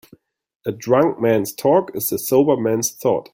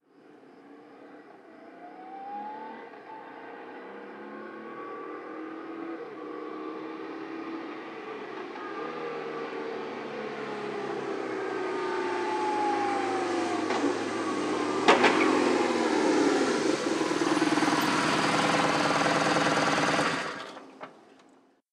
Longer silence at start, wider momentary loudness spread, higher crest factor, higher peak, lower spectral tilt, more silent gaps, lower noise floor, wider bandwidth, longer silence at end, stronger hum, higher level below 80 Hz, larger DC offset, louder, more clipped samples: first, 0.65 s vs 0.3 s; second, 9 LU vs 18 LU; second, 16 dB vs 24 dB; first, -2 dBFS vs -6 dBFS; about the same, -5 dB/octave vs -4 dB/octave; neither; second, -52 dBFS vs -61 dBFS; first, 17 kHz vs 14.5 kHz; second, 0.1 s vs 0.7 s; neither; first, -60 dBFS vs -70 dBFS; neither; first, -18 LUFS vs -28 LUFS; neither